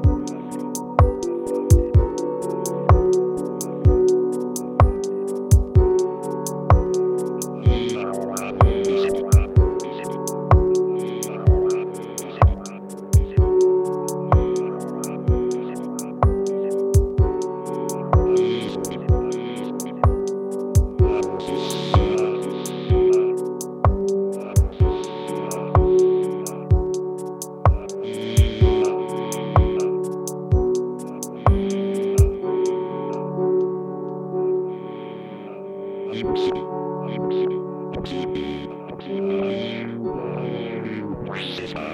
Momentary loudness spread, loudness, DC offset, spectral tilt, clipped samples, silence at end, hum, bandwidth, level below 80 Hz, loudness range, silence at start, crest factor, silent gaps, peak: 11 LU; -22 LUFS; under 0.1%; -7 dB/octave; under 0.1%; 0 s; none; 16 kHz; -26 dBFS; 6 LU; 0 s; 18 dB; none; -2 dBFS